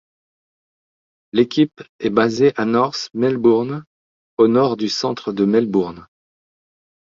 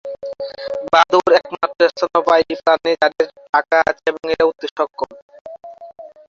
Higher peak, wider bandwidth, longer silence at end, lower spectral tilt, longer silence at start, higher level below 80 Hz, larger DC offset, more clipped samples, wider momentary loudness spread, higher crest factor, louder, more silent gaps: about the same, -2 dBFS vs 0 dBFS; about the same, 7.6 kHz vs 7.4 kHz; first, 1.1 s vs 0.2 s; first, -6 dB/octave vs -3.5 dB/octave; first, 1.35 s vs 0.05 s; about the same, -60 dBFS vs -56 dBFS; neither; neither; second, 9 LU vs 15 LU; about the same, 18 dB vs 18 dB; about the same, -18 LUFS vs -16 LUFS; first, 1.89-1.99 s, 3.87-4.37 s vs 3.49-3.53 s, 4.71-4.76 s, 5.22-5.29 s, 5.41-5.45 s